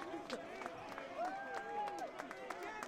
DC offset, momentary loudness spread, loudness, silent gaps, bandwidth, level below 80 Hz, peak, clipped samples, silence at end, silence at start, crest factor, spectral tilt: under 0.1%; 5 LU; -45 LUFS; none; 16.5 kHz; -76 dBFS; -26 dBFS; under 0.1%; 0 s; 0 s; 20 dB; -3.5 dB/octave